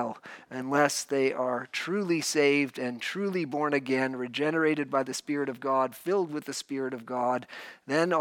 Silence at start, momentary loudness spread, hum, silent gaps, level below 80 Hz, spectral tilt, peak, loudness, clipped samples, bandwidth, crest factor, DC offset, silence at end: 0 s; 9 LU; none; none; -82 dBFS; -4 dB/octave; -8 dBFS; -29 LUFS; under 0.1%; 18 kHz; 20 dB; under 0.1%; 0 s